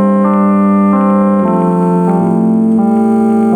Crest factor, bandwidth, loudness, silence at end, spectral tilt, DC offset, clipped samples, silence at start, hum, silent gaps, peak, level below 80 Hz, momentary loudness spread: 8 dB; 9.4 kHz; -10 LUFS; 0 s; -10.5 dB/octave; under 0.1%; under 0.1%; 0 s; none; none; 0 dBFS; -52 dBFS; 2 LU